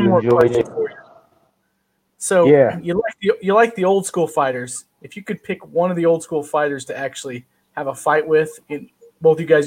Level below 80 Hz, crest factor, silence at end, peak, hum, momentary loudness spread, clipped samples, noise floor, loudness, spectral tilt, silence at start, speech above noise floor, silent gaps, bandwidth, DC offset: -58 dBFS; 18 dB; 0 s; 0 dBFS; none; 17 LU; under 0.1%; -68 dBFS; -18 LUFS; -5.5 dB/octave; 0 s; 51 dB; none; 16 kHz; under 0.1%